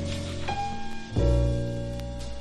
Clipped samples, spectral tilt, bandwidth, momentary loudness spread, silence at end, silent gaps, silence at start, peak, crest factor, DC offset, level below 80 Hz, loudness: under 0.1%; -6.5 dB/octave; 11.5 kHz; 11 LU; 0 s; none; 0 s; -12 dBFS; 14 dB; under 0.1%; -32 dBFS; -30 LUFS